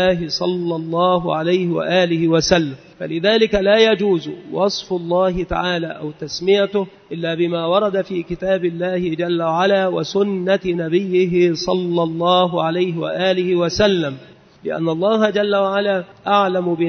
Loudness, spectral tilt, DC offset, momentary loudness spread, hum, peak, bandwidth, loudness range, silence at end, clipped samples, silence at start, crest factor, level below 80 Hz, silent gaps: -18 LUFS; -5.5 dB/octave; under 0.1%; 8 LU; none; -2 dBFS; 6.6 kHz; 3 LU; 0 s; under 0.1%; 0 s; 16 dB; -46 dBFS; none